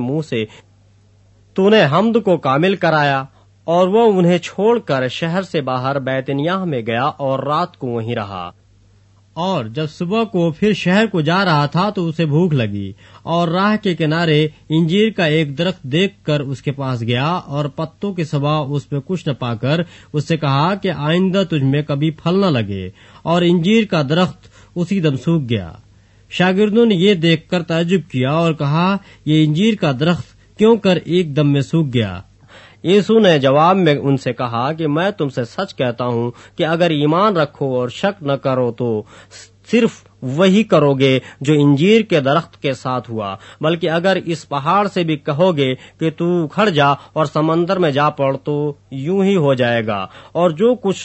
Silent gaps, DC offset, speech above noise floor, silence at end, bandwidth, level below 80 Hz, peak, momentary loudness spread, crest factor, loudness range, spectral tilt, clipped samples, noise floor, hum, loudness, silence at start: none; under 0.1%; 34 dB; 0 s; 8.4 kHz; -54 dBFS; 0 dBFS; 10 LU; 16 dB; 5 LU; -7 dB/octave; under 0.1%; -50 dBFS; none; -16 LUFS; 0 s